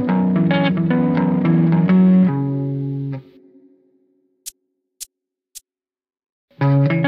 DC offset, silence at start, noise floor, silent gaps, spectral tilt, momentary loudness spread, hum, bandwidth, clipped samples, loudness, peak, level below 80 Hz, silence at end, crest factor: under 0.1%; 0 s; under -90 dBFS; 6.32-6.48 s; -8 dB/octave; 22 LU; none; 13.5 kHz; under 0.1%; -17 LUFS; -4 dBFS; -58 dBFS; 0 s; 14 dB